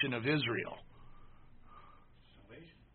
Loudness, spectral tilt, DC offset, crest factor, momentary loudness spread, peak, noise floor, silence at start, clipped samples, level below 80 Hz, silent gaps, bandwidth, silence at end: -35 LUFS; -3.5 dB/octave; under 0.1%; 20 dB; 26 LU; -20 dBFS; -60 dBFS; 0 s; under 0.1%; -60 dBFS; none; 4.5 kHz; 0.25 s